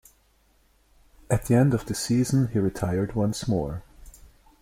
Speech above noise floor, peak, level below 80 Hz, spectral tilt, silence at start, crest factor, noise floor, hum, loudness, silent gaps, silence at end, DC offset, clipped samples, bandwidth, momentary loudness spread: 39 dB; -8 dBFS; -46 dBFS; -6.5 dB/octave; 1.3 s; 18 dB; -63 dBFS; none; -25 LUFS; none; 0.5 s; under 0.1%; under 0.1%; 16 kHz; 7 LU